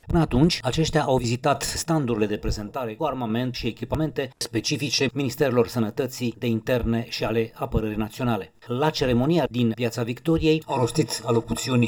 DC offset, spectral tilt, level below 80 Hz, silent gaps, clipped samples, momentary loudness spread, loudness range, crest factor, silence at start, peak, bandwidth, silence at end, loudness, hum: under 0.1%; -5.5 dB/octave; -40 dBFS; none; under 0.1%; 7 LU; 3 LU; 18 dB; 0.05 s; -6 dBFS; over 20 kHz; 0 s; -24 LUFS; none